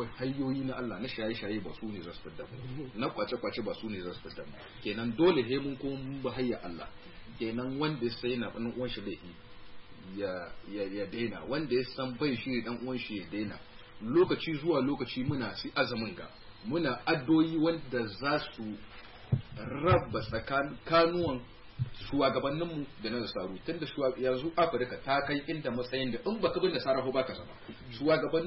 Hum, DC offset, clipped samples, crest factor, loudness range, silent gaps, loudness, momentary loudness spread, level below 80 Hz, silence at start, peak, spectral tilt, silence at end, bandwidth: none; under 0.1%; under 0.1%; 18 dB; 6 LU; none; -33 LUFS; 17 LU; -56 dBFS; 0 s; -16 dBFS; -10 dB/octave; 0 s; 5.8 kHz